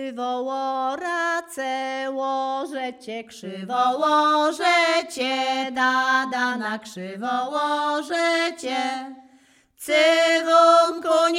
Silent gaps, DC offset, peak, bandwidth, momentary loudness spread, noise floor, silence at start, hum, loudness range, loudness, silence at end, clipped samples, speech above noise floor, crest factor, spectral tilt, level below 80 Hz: none; under 0.1%; -4 dBFS; 16 kHz; 14 LU; -57 dBFS; 0 s; none; 6 LU; -21 LUFS; 0 s; under 0.1%; 35 dB; 18 dB; -2.5 dB/octave; -76 dBFS